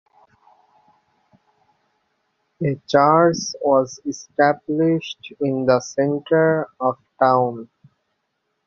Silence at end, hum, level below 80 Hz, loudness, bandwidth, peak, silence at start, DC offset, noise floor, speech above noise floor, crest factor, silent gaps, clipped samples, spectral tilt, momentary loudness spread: 1 s; none; -64 dBFS; -19 LUFS; 7.6 kHz; -2 dBFS; 2.6 s; under 0.1%; -74 dBFS; 55 dB; 20 dB; none; under 0.1%; -5.5 dB/octave; 10 LU